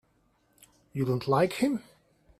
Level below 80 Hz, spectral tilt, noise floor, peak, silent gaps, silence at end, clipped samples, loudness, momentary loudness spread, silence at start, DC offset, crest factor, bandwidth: -66 dBFS; -6.5 dB/octave; -69 dBFS; -12 dBFS; none; 0.6 s; under 0.1%; -28 LUFS; 11 LU; 0.95 s; under 0.1%; 20 dB; 15 kHz